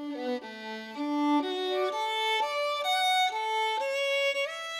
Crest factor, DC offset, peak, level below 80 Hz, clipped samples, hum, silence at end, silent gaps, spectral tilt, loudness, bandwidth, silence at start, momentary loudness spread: 12 dB; under 0.1%; -18 dBFS; -84 dBFS; under 0.1%; none; 0 s; none; -1.5 dB/octave; -28 LUFS; 16.5 kHz; 0 s; 10 LU